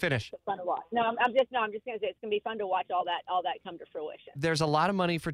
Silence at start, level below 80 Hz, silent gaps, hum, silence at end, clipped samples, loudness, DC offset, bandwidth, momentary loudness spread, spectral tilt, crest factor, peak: 0 s; -64 dBFS; none; none; 0 s; under 0.1%; -31 LUFS; under 0.1%; 14.5 kHz; 14 LU; -5.5 dB/octave; 18 dB; -14 dBFS